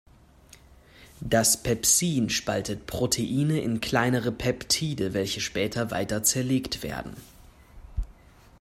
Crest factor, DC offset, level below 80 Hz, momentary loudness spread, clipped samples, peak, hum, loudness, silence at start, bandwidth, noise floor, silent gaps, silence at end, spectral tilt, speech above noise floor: 20 dB; under 0.1%; -46 dBFS; 17 LU; under 0.1%; -8 dBFS; none; -25 LUFS; 1 s; 16 kHz; -54 dBFS; none; 0.5 s; -3.5 dB/octave; 27 dB